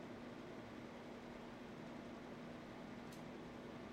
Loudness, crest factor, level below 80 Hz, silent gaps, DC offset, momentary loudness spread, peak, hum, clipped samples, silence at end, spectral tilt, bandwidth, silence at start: -53 LUFS; 12 dB; -72 dBFS; none; under 0.1%; 1 LU; -40 dBFS; none; under 0.1%; 0 s; -6 dB/octave; 16 kHz; 0 s